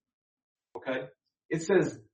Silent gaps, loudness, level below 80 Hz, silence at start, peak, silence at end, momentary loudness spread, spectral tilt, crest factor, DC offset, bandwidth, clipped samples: 1.45-1.49 s; -31 LUFS; -72 dBFS; 0.75 s; -12 dBFS; 0.1 s; 19 LU; -6 dB/octave; 22 dB; under 0.1%; 8.4 kHz; under 0.1%